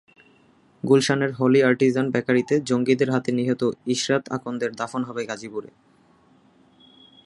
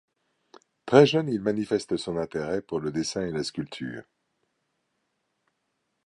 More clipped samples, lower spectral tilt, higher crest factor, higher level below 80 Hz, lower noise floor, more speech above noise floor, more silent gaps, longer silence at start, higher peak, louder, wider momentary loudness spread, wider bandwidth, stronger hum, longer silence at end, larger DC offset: neither; about the same, -5.5 dB/octave vs -5.5 dB/octave; second, 18 dB vs 26 dB; about the same, -66 dBFS vs -62 dBFS; second, -57 dBFS vs -78 dBFS; second, 36 dB vs 52 dB; neither; about the same, 0.85 s vs 0.85 s; about the same, -4 dBFS vs -2 dBFS; first, -22 LUFS vs -26 LUFS; second, 12 LU vs 17 LU; about the same, 11.5 kHz vs 11.5 kHz; neither; second, 1.6 s vs 2.05 s; neither